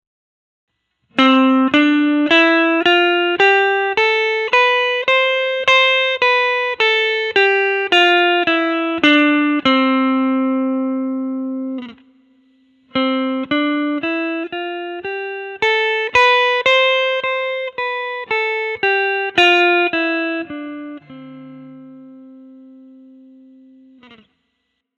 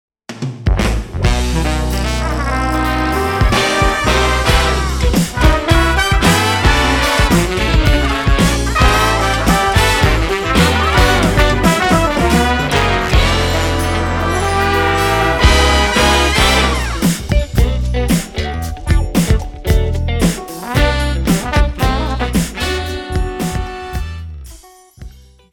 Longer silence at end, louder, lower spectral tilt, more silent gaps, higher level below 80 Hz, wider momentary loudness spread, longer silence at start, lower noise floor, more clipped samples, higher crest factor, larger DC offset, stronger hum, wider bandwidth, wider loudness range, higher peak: first, 2.4 s vs 0.45 s; about the same, -15 LUFS vs -14 LUFS; about the same, -3.5 dB/octave vs -4.5 dB/octave; neither; second, -62 dBFS vs -18 dBFS; first, 13 LU vs 8 LU; first, 1.15 s vs 0.3 s; first, -71 dBFS vs -40 dBFS; neither; about the same, 16 dB vs 14 dB; neither; neither; second, 9 kHz vs 18 kHz; first, 8 LU vs 5 LU; about the same, 0 dBFS vs 0 dBFS